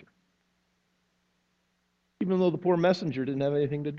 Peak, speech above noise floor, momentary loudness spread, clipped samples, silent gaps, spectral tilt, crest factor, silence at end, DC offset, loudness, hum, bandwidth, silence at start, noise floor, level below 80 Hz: -12 dBFS; 48 dB; 6 LU; under 0.1%; none; -8 dB/octave; 18 dB; 0 s; under 0.1%; -27 LUFS; 60 Hz at -55 dBFS; 7.4 kHz; 2.2 s; -74 dBFS; -68 dBFS